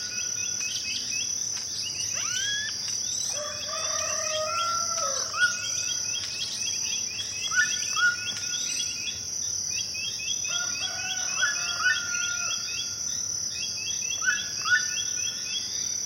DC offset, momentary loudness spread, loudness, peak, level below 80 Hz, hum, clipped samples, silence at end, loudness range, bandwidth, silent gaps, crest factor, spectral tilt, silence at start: under 0.1%; 5 LU; -26 LUFS; -12 dBFS; -64 dBFS; none; under 0.1%; 0 s; 1 LU; 16.5 kHz; none; 18 dB; 1.5 dB/octave; 0 s